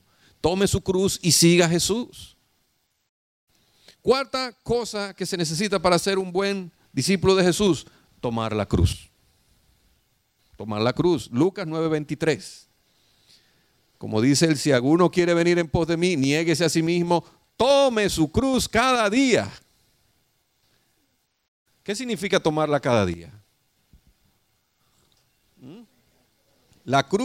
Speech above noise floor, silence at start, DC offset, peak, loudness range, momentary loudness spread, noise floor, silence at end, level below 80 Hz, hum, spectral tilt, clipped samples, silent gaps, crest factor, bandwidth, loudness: 49 dB; 0.45 s; under 0.1%; -4 dBFS; 8 LU; 11 LU; -70 dBFS; 0 s; -46 dBFS; none; -4.5 dB/octave; under 0.1%; 3.09-3.47 s, 21.48-21.66 s; 20 dB; 16 kHz; -22 LUFS